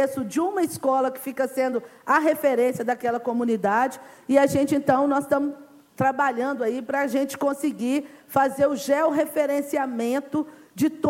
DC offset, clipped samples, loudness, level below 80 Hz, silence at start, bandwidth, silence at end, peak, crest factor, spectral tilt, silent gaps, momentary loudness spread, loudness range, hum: under 0.1%; under 0.1%; -24 LUFS; -66 dBFS; 0 s; 17 kHz; 0 s; -6 dBFS; 18 dB; -5.5 dB/octave; none; 7 LU; 2 LU; none